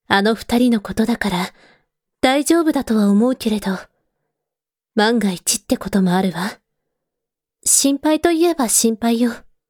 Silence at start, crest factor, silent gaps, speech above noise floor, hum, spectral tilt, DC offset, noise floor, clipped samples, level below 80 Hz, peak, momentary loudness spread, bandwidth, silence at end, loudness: 0.1 s; 18 dB; none; 69 dB; none; -4 dB/octave; under 0.1%; -86 dBFS; under 0.1%; -48 dBFS; 0 dBFS; 8 LU; over 20 kHz; 0.3 s; -17 LUFS